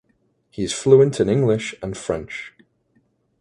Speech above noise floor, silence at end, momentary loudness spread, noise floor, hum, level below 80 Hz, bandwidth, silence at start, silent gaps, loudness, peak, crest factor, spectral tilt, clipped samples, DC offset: 47 dB; 0.95 s; 19 LU; -65 dBFS; none; -50 dBFS; 11 kHz; 0.6 s; none; -19 LUFS; 0 dBFS; 20 dB; -6 dB/octave; under 0.1%; under 0.1%